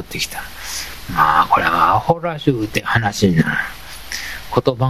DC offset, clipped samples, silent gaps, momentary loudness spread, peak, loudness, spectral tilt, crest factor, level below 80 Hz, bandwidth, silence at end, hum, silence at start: 1%; under 0.1%; none; 13 LU; 0 dBFS; -17 LUFS; -5 dB/octave; 18 dB; -40 dBFS; 16 kHz; 0 s; none; 0 s